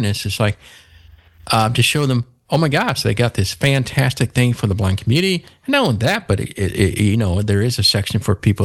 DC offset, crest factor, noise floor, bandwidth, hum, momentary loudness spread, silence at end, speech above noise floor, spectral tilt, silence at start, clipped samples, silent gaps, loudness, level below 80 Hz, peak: under 0.1%; 16 dB; -46 dBFS; 16 kHz; none; 5 LU; 0 s; 29 dB; -5 dB/octave; 0 s; under 0.1%; none; -17 LUFS; -40 dBFS; -2 dBFS